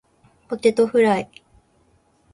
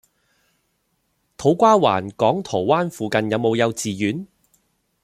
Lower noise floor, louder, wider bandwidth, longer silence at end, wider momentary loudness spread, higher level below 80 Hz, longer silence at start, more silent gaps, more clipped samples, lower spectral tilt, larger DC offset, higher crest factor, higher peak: second, -60 dBFS vs -69 dBFS; about the same, -19 LUFS vs -19 LUFS; second, 11.5 kHz vs 15.5 kHz; first, 1.1 s vs 0.8 s; first, 15 LU vs 9 LU; about the same, -60 dBFS vs -60 dBFS; second, 0.5 s vs 1.4 s; neither; neither; about the same, -5.5 dB/octave vs -5.5 dB/octave; neither; about the same, 18 dB vs 20 dB; about the same, -4 dBFS vs -2 dBFS